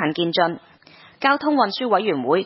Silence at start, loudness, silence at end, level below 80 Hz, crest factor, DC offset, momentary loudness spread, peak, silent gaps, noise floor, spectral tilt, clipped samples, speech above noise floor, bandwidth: 0 s; -20 LUFS; 0 s; -70 dBFS; 18 dB; under 0.1%; 5 LU; -4 dBFS; none; -49 dBFS; -9.5 dB/octave; under 0.1%; 29 dB; 5.8 kHz